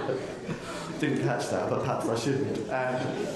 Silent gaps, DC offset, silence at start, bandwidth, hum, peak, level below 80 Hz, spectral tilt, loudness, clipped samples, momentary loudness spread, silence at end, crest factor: none; under 0.1%; 0 s; 12.5 kHz; none; -14 dBFS; -60 dBFS; -5.5 dB/octave; -30 LUFS; under 0.1%; 7 LU; 0 s; 16 dB